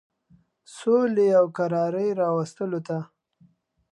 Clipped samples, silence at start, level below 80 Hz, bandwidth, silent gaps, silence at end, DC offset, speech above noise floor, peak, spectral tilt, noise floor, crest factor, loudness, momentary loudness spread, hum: under 0.1%; 0.7 s; -76 dBFS; 11.5 kHz; none; 0.85 s; under 0.1%; 38 dB; -8 dBFS; -7.5 dB/octave; -61 dBFS; 16 dB; -24 LUFS; 12 LU; none